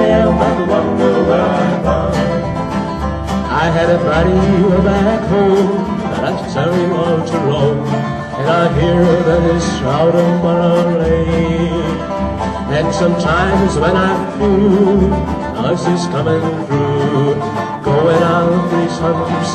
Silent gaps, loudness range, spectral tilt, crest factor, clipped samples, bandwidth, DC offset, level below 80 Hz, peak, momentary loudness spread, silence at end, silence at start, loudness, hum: none; 2 LU; -7 dB/octave; 14 dB; under 0.1%; 9.6 kHz; under 0.1%; -28 dBFS; 0 dBFS; 7 LU; 0 s; 0 s; -14 LUFS; none